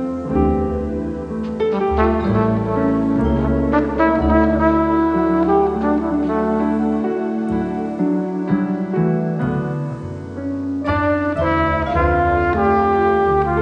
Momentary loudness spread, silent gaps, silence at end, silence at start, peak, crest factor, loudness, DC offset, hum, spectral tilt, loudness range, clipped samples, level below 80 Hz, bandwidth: 8 LU; none; 0 s; 0 s; -2 dBFS; 14 dB; -18 LUFS; under 0.1%; none; -9.5 dB/octave; 4 LU; under 0.1%; -30 dBFS; 8.6 kHz